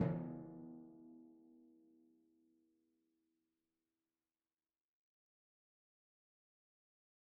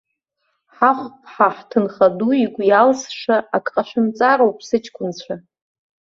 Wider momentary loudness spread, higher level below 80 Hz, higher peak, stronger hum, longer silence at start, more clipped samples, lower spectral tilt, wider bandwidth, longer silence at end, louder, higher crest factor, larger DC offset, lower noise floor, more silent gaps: first, 23 LU vs 14 LU; second, -80 dBFS vs -64 dBFS; second, -22 dBFS vs -2 dBFS; neither; second, 0 s vs 0.8 s; neither; first, -8.5 dB/octave vs -5 dB/octave; second, 2.5 kHz vs 7.6 kHz; first, 5.45 s vs 0.75 s; second, -49 LUFS vs -18 LUFS; first, 30 dB vs 18 dB; neither; first, under -90 dBFS vs -72 dBFS; neither